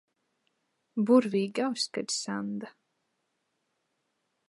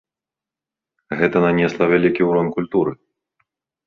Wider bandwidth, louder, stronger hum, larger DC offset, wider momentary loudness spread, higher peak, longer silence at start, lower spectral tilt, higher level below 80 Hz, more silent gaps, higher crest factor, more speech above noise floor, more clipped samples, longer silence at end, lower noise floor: first, 11.5 kHz vs 6.8 kHz; second, -29 LUFS vs -18 LUFS; neither; neither; first, 15 LU vs 5 LU; second, -10 dBFS vs -2 dBFS; second, 0.95 s vs 1.1 s; second, -4.5 dB/octave vs -8 dB/octave; second, -84 dBFS vs -54 dBFS; neither; about the same, 22 dB vs 18 dB; second, 51 dB vs 71 dB; neither; first, 1.8 s vs 0.95 s; second, -79 dBFS vs -88 dBFS